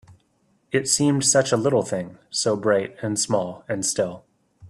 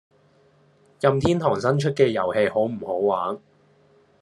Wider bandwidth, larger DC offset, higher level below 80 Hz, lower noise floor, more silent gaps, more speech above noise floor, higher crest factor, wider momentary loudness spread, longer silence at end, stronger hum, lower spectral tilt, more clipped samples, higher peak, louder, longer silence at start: first, 14.5 kHz vs 11.5 kHz; neither; about the same, -62 dBFS vs -58 dBFS; first, -65 dBFS vs -58 dBFS; neither; first, 43 dB vs 37 dB; about the same, 18 dB vs 20 dB; first, 11 LU vs 6 LU; second, 0 s vs 0.85 s; neither; second, -3.5 dB/octave vs -7 dB/octave; neither; about the same, -6 dBFS vs -4 dBFS; about the same, -22 LUFS vs -22 LUFS; second, 0.1 s vs 1 s